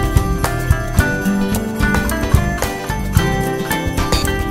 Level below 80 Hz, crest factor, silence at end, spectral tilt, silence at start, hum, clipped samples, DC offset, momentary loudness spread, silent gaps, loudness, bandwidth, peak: -22 dBFS; 16 dB; 0 s; -5.5 dB/octave; 0 s; none; under 0.1%; under 0.1%; 3 LU; none; -18 LUFS; 16.5 kHz; 0 dBFS